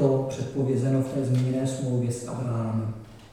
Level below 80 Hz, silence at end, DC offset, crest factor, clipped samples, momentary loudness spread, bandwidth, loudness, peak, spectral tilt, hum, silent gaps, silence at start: -56 dBFS; 0.05 s; under 0.1%; 16 dB; under 0.1%; 7 LU; 11.5 kHz; -27 LUFS; -10 dBFS; -7.5 dB/octave; none; none; 0 s